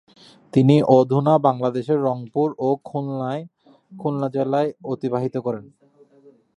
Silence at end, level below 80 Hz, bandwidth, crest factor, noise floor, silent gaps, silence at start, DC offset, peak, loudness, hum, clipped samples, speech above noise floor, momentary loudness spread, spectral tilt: 0.95 s; -66 dBFS; 10.5 kHz; 20 dB; -53 dBFS; none; 0.55 s; under 0.1%; -2 dBFS; -21 LUFS; none; under 0.1%; 33 dB; 12 LU; -9 dB/octave